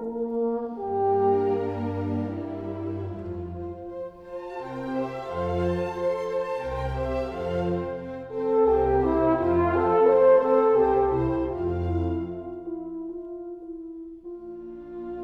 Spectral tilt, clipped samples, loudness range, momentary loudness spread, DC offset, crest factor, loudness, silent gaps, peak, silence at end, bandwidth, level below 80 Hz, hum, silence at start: -9 dB/octave; under 0.1%; 12 LU; 17 LU; under 0.1%; 16 dB; -25 LUFS; none; -8 dBFS; 0 s; 7.2 kHz; -44 dBFS; none; 0 s